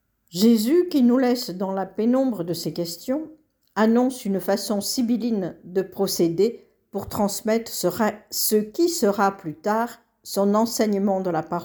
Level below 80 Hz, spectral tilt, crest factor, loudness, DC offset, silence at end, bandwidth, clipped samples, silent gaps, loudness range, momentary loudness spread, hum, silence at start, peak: -62 dBFS; -5 dB/octave; 16 dB; -23 LUFS; under 0.1%; 0 s; over 20 kHz; under 0.1%; none; 2 LU; 10 LU; none; 0.35 s; -6 dBFS